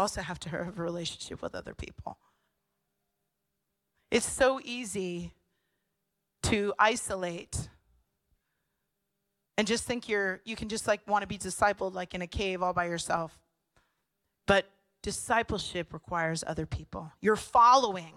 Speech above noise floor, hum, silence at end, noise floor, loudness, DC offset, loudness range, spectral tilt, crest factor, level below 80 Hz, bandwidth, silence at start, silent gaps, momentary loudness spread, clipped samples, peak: 53 dB; none; 0.05 s; -83 dBFS; -30 LUFS; under 0.1%; 5 LU; -3.5 dB/octave; 22 dB; -54 dBFS; 15.5 kHz; 0 s; none; 15 LU; under 0.1%; -10 dBFS